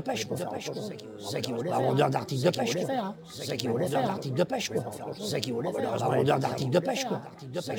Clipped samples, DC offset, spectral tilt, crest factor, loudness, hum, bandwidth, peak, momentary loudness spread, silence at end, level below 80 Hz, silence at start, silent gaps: under 0.1%; under 0.1%; -5.5 dB/octave; 20 dB; -30 LUFS; none; 19 kHz; -8 dBFS; 11 LU; 0 s; -70 dBFS; 0 s; none